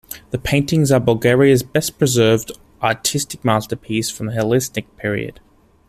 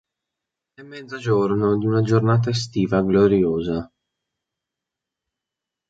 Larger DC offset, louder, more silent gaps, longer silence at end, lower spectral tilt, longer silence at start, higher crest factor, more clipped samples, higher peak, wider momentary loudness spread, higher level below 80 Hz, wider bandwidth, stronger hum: neither; about the same, -18 LUFS vs -20 LUFS; neither; second, 0.55 s vs 2.05 s; second, -5 dB/octave vs -7.5 dB/octave; second, 0.1 s vs 0.8 s; about the same, 16 dB vs 18 dB; neither; about the same, -2 dBFS vs -4 dBFS; about the same, 11 LU vs 13 LU; first, -44 dBFS vs -50 dBFS; first, 15.5 kHz vs 7.8 kHz; neither